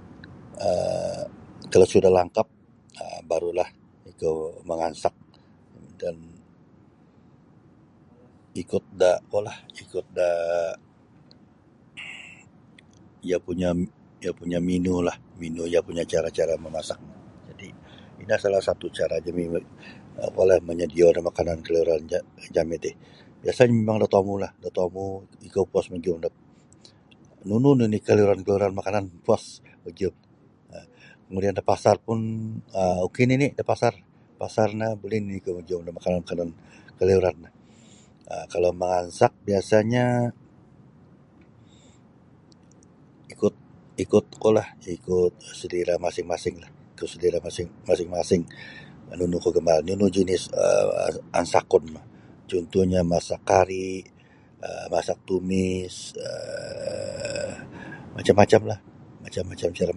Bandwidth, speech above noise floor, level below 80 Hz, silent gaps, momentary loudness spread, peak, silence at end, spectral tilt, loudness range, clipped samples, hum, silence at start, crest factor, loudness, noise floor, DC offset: 11.5 kHz; 32 dB; -50 dBFS; none; 18 LU; -2 dBFS; 0 s; -6 dB/octave; 7 LU; under 0.1%; none; 0 s; 24 dB; -25 LUFS; -55 dBFS; under 0.1%